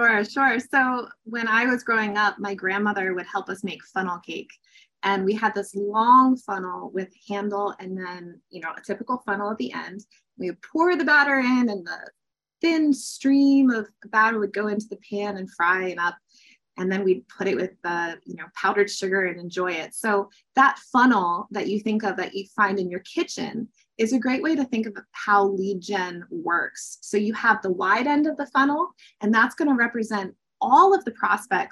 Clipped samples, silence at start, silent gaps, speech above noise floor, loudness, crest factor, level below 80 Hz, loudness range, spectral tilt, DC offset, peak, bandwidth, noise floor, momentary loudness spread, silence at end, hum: under 0.1%; 0 s; none; 34 dB; -23 LUFS; 18 dB; -74 dBFS; 5 LU; -4.5 dB/octave; under 0.1%; -4 dBFS; 12.5 kHz; -58 dBFS; 14 LU; 0.05 s; none